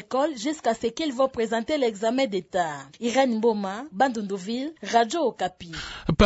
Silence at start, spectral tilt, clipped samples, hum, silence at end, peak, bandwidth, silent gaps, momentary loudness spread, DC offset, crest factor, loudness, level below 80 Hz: 0 s; -5 dB/octave; under 0.1%; none; 0 s; -4 dBFS; 8 kHz; none; 8 LU; under 0.1%; 20 dB; -26 LUFS; -44 dBFS